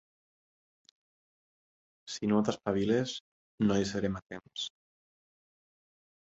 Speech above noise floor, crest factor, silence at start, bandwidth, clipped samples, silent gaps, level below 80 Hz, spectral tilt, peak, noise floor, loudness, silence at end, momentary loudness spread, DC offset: over 59 dB; 22 dB; 2.05 s; 8 kHz; under 0.1%; 3.20-3.58 s, 4.22-4.26 s; -62 dBFS; -5.5 dB/octave; -14 dBFS; under -90 dBFS; -32 LUFS; 1.55 s; 14 LU; under 0.1%